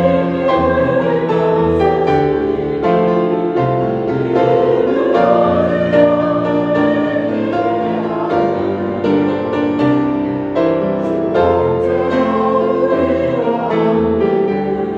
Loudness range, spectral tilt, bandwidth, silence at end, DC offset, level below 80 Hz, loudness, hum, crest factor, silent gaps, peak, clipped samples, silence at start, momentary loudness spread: 2 LU; -8.5 dB/octave; 7.4 kHz; 0 s; under 0.1%; -44 dBFS; -15 LUFS; none; 14 dB; none; 0 dBFS; under 0.1%; 0 s; 5 LU